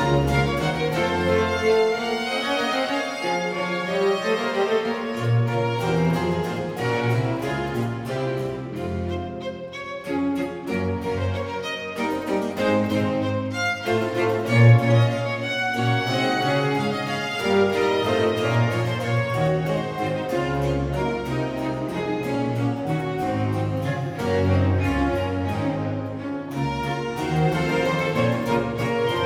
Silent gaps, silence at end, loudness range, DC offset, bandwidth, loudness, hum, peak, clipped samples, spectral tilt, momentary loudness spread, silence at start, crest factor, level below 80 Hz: none; 0 s; 6 LU; under 0.1%; 15.5 kHz; -23 LUFS; none; -4 dBFS; under 0.1%; -6.5 dB/octave; 7 LU; 0 s; 18 dB; -44 dBFS